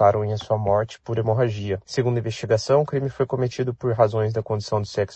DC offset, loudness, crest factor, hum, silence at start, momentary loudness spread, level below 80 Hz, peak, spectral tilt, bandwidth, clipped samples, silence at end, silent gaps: under 0.1%; -23 LUFS; 18 dB; none; 0 s; 6 LU; -52 dBFS; -4 dBFS; -7 dB/octave; 8.4 kHz; under 0.1%; 0 s; none